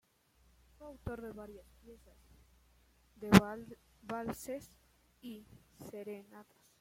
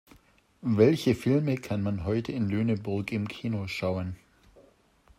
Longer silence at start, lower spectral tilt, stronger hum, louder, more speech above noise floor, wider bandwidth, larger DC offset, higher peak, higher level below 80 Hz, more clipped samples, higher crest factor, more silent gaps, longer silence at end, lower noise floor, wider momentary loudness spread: first, 0.8 s vs 0.65 s; second, -6 dB/octave vs -7.5 dB/octave; neither; second, -34 LUFS vs -28 LUFS; about the same, 34 dB vs 34 dB; about the same, 16.5 kHz vs 15.5 kHz; neither; about the same, -6 dBFS vs -8 dBFS; about the same, -60 dBFS vs -58 dBFS; neither; first, 32 dB vs 20 dB; neither; second, 0.4 s vs 1.05 s; first, -70 dBFS vs -61 dBFS; first, 28 LU vs 11 LU